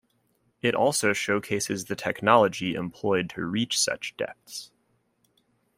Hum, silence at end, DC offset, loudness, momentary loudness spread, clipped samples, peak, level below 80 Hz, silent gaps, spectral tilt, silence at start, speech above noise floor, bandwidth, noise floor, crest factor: none; 1.1 s; under 0.1%; -26 LUFS; 13 LU; under 0.1%; -4 dBFS; -66 dBFS; none; -3.5 dB/octave; 0.65 s; 44 dB; 16 kHz; -70 dBFS; 24 dB